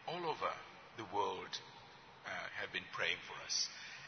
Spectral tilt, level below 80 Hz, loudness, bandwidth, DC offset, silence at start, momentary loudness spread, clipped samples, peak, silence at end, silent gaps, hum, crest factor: 0 dB/octave; -82 dBFS; -41 LUFS; 6.4 kHz; under 0.1%; 0 s; 15 LU; under 0.1%; -22 dBFS; 0 s; none; none; 22 dB